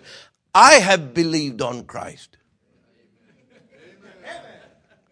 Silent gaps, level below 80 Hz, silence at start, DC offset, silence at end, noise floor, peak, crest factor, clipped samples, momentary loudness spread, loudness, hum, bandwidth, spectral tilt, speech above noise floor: none; -62 dBFS; 0.55 s; under 0.1%; 0.75 s; -64 dBFS; 0 dBFS; 20 dB; under 0.1%; 28 LU; -15 LUFS; none; 11 kHz; -2.5 dB/octave; 47 dB